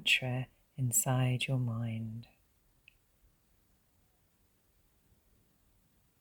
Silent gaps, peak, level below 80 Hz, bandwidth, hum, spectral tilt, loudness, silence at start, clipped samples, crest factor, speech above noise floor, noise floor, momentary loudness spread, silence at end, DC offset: none; -16 dBFS; -68 dBFS; 19 kHz; none; -3.5 dB/octave; -33 LUFS; 0 s; under 0.1%; 22 dB; 39 dB; -72 dBFS; 15 LU; 3.95 s; under 0.1%